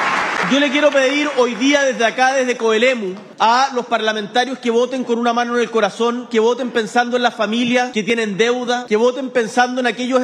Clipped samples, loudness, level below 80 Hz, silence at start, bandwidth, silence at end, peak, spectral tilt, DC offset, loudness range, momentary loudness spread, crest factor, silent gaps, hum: under 0.1%; -16 LUFS; -72 dBFS; 0 s; 11 kHz; 0 s; 0 dBFS; -3.5 dB/octave; under 0.1%; 2 LU; 4 LU; 16 dB; none; none